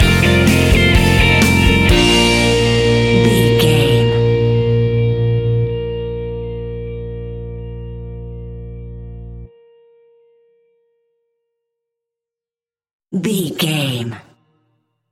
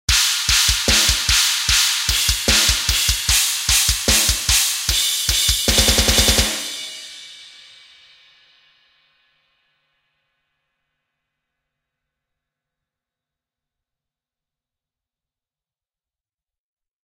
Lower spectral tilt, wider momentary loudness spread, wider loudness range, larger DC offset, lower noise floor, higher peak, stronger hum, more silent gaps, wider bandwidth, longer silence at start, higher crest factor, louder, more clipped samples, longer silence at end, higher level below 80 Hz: first, -5.5 dB/octave vs -1 dB/octave; first, 20 LU vs 7 LU; first, 21 LU vs 7 LU; neither; about the same, under -90 dBFS vs under -90 dBFS; about the same, 0 dBFS vs 0 dBFS; neither; first, 12.93-13.00 s vs none; about the same, 17 kHz vs 16 kHz; about the same, 0 s vs 0.1 s; second, 16 dB vs 22 dB; about the same, -14 LUFS vs -15 LUFS; neither; second, 0.9 s vs 9.55 s; about the same, -26 dBFS vs -30 dBFS